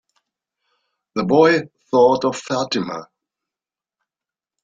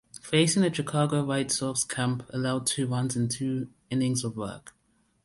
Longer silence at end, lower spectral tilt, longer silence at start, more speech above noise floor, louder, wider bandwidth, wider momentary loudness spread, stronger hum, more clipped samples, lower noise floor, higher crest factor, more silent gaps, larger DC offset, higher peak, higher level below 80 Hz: first, 1.6 s vs 0.55 s; about the same, -5 dB/octave vs -4.5 dB/octave; first, 1.15 s vs 0.15 s; first, 73 dB vs 42 dB; first, -18 LUFS vs -27 LUFS; second, 7.8 kHz vs 12 kHz; first, 14 LU vs 9 LU; neither; neither; first, -90 dBFS vs -69 dBFS; about the same, 20 dB vs 18 dB; neither; neither; first, -2 dBFS vs -10 dBFS; about the same, -62 dBFS vs -62 dBFS